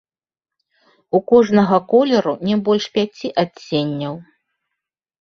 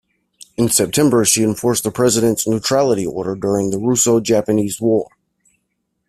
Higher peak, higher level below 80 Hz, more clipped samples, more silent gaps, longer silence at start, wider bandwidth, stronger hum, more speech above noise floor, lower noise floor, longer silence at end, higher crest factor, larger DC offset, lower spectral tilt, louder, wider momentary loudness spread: about the same, -2 dBFS vs 0 dBFS; second, -60 dBFS vs -52 dBFS; neither; neither; first, 1.15 s vs 0.6 s; second, 7 kHz vs 16 kHz; neither; first, 72 dB vs 55 dB; first, -88 dBFS vs -71 dBFS; about the same, 1 s vs 1.05 s; about the same, 18 dB vs 16 dB; neither; first, -6.5 dB/octave vs -4 dB/octave; about the same, -17 LUFS vs -16 LUFS; first, 10 LU vs 7 LU